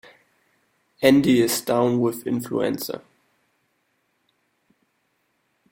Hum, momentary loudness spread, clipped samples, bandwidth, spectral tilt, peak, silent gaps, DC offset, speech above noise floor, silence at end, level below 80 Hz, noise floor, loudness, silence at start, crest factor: none; 12 LU; under 0.1%; 16.5 kHz; -5 dB/octave; -2 dBFS; none; under 0.1%; 50 dB; 2.75 s; -62 dBFS; -71 dBFS; -21 LUFS; 1 s; 22 dB